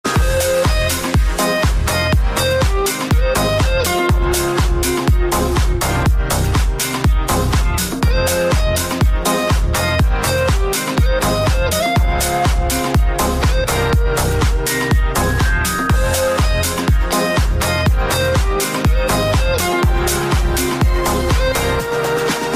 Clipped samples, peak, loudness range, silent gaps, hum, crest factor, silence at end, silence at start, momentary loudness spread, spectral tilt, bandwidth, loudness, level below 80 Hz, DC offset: under 0.1%; -4 dBFS; 1 LU; none; none; 12 dB; 0 s; 0.05 s; 2 LU; -4.5 dB/octave; 15.5 kHz; -16 LUFS; -18 dBFS; 0.4%